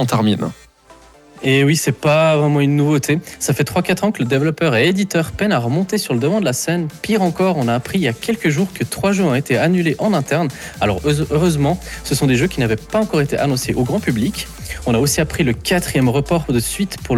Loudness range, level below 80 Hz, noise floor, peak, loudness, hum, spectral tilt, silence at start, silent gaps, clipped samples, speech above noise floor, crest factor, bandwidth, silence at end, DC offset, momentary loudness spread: 2 LU; -38 dBFS; -45 dBFS; -4 dBFS; -17 LUFS; none; -5.5 dB/octave; 0 s; none; under 0.1%; 29 dB; 12 dB; 19 kHz; 0 s; under 0.1%; 6 LU